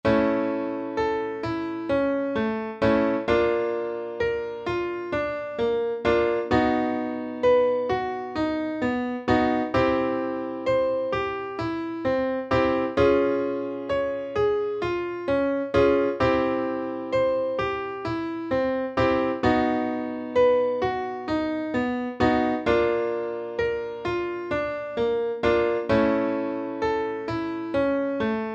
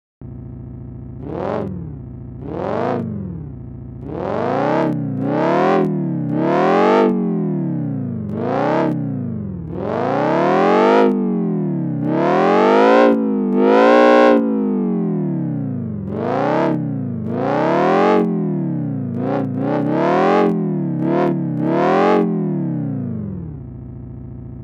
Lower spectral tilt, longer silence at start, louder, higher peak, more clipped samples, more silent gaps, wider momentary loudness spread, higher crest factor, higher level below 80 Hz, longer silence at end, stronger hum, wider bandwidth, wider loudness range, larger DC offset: second, -7 dB/octave vs -8.5 dB/octave; second, 0.05 s vs 0.2 s; second, -25 LUFS vs -17 LUFS; second, -8 dBFS vs 0 dBFS; neither; neither; second, 8 LU vs 19 LU; about the same, 16 dB vs 18 dB; about the same, -50 dBFS vs -46 dBFS; about the same, 0 s vs 0 s; neither; about the same, 8 kHz vs 8.6 kHz; second, 2 LU vs 9 LU; neither